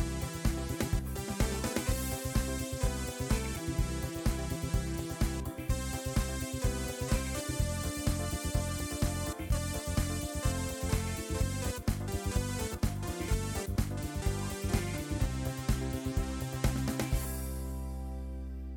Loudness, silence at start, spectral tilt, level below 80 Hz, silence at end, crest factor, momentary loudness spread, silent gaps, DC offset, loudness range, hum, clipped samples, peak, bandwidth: -35 LUFS; 0 s; -5 dB/octave; -38 dBFS; 0 s; 18 dB; 3 LU; none; under 0.1%; 1 LU; none; under 0.1%; -16 dBFS; 19 kHz